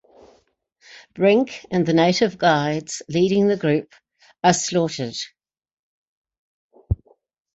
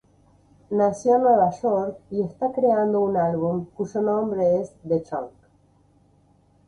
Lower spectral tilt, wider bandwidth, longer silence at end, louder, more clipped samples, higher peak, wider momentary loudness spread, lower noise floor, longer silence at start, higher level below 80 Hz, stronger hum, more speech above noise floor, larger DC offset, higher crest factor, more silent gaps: second, -5 dB/octave vs -8.5 dB/octave; second, 8.2 kHz vs 10.5 kHz; second, 0.6 s vs 1.4 s; first, -20 LUFS vs -23 LUFS; neither; first, -4 dBFS vs -8 dBFS; about the same, 11 LU vs 10 LU; about the same, -62 dBFS vs -59 dBFS; first, 1.15 s vs 0.7 s; first, -44 dBFS vs -60 dBFS; neither; first, 43 dB vs 37 dB; neither; about the same, 18 dB vs 16 dB; first, 5.73-6.24 s, 6.38-6.70 s vs none